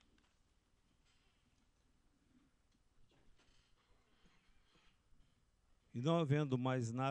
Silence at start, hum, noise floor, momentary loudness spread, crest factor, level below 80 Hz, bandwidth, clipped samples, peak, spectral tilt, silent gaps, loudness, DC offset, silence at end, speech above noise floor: 5.95 s; none; -77 dBFS; 7 LU; 22 dB; -76 dBFS; 9.2 kHz; under 0.1%; -24 dBFS; -7 dB/octave; none; -38 LUFS; under 0.1%; 0 s; 40 dB